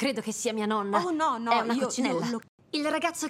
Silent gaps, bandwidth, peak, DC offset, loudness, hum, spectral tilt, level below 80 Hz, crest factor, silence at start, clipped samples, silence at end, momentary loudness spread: 2.49-2.58 s; 15.5 kHz; -10 dBFS; under 0.1%; -28 LUFS; none; -3.5 dB/octave; -76 dBFS; 18 dB; 0 s; under 0.1%; 0 s; 6 LU